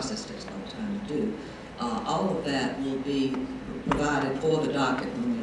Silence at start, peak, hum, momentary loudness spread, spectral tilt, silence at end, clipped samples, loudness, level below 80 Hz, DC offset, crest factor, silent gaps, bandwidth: 0 s; -10 dBFS; none; 9 LU; -5.5 dB/octave; 0 s; under 0.1%; -29 LUFS; -50 dBFS; under 0.1%; 18 dB; none; 11 kHz